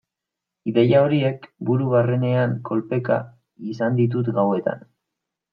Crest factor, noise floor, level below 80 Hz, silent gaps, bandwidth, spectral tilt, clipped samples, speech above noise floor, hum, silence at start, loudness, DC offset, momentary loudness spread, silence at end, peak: 18 dB; -85 dBFS; -66 dBFS; none; 6 kHz; -10 dB/octave; under 0.1%; 65 dB; none; 0.65 s; -21 LUFS; under 0.1%; 14 LU; 0.75 s; -4 dBFS